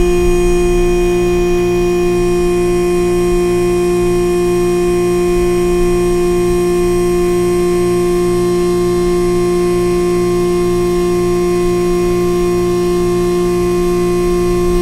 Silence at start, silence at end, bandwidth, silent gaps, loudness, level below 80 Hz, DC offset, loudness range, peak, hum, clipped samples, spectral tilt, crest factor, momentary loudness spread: 0 s; 0 s; 15.5 kHz; none; -13 LUFS; -24 dBFS; under 0.1%; 1 LU; 0 dBFS; 60 Hz at -35 dBFS; under 0.1%; -6.5 dB/octave; 12 dB; 1 LU